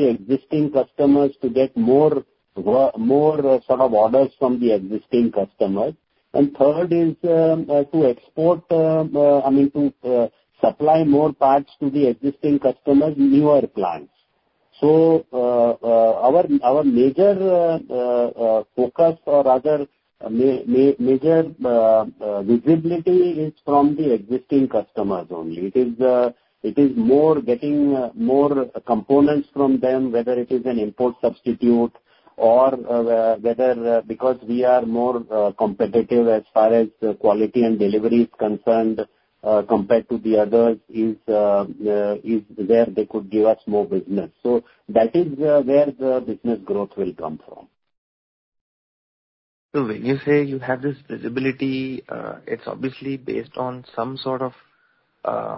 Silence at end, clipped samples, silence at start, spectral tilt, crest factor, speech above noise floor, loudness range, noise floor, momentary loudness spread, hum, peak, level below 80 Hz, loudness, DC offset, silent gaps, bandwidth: 0 s; under 0.1%; 0 s; -12.5 dB/octave; 18 dB; 48 dB; 7 LU; -66 dBFS; 10 LU; none; -2 dBFS; -58 dBFS; -19 LUFS; under 0.1%; 47.98-48.52 s, 48.61-49.69 s; 5.8 kHz